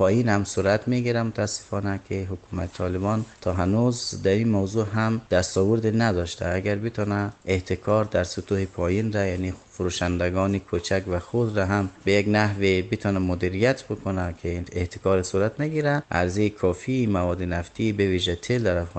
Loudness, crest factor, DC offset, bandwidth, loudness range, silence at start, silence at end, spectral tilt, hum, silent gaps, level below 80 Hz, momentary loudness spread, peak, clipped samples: -25 LUFS; 18 dB; under 0.1%; 9 kHz; 2 LU; 0 s; 0 s; -6 dB/octave; none; none; -46 dBFS; 7 LU; -6 dBFS; under 0.1%